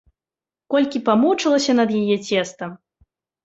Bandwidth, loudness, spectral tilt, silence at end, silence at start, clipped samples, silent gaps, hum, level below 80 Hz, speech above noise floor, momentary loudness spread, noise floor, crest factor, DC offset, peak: 8 kHz; -19 LUFS; -4.5 dB/octave; 0.7 s; 0.7 s; under 0.1%; none; none; -62 dBFS; over 72 dB; 11 LU; under -90 dBFS; 16 dB; under 0.1%; -4 dBFS